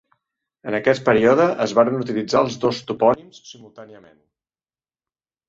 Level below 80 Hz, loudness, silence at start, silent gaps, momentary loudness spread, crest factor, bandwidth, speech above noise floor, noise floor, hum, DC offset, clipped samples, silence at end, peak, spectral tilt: -58 dBFS; -19 LUFS; 0.65 s; none; 9 LU; 18 dB; 7.8 kHz; over 71 dB; under -90 dBFS; none; under 0.1%; under 0.1%; 1.55 s; -2 dBFS; -5.5 dB/octave